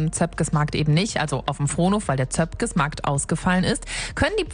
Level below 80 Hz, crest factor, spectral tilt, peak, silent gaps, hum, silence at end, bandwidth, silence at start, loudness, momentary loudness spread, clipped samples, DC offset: -38 dBFS; 16 dB; -5 dB/octave; -8 dBFS; none; none; 0 s; 10.5 kHz; 0 s; -23 LUFS; 4 LU; under 0.1%; under 0.1%